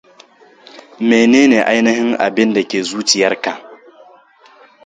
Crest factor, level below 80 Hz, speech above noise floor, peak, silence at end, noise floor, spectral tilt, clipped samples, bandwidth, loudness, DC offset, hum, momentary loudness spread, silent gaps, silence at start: 16 dB; -60 dBFS; 33 dB; 0 dBFS; 1.1 s; -46 dBFS; -3.5 dB/octave; under 0.1%; 9.4 kHz; -13 LUFS; under 0.1%; none; 11 LU; none; 0.75 s